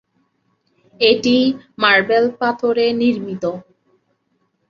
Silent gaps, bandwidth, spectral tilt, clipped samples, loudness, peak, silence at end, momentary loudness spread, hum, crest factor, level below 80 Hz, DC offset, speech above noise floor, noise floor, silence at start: none; 7.4 kHz; -5 dB/octave; under 0.1%; -16 LUFS; -2 dBFS; 1.1 s; 11 LU; none; 18 dB; -60 dBFS; under 0.1%; 50 dB; -66 dBFS; 1 s